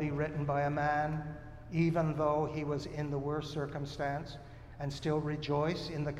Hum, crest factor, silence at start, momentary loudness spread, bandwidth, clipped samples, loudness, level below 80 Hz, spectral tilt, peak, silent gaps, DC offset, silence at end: none; 16 dB; 0 s; 10 LU; 10 kHz; under 0.1%; -35 LUFS; -54 dBFS; -7 dB/octave; -18 dBFS; none; under 0.1%; 0 s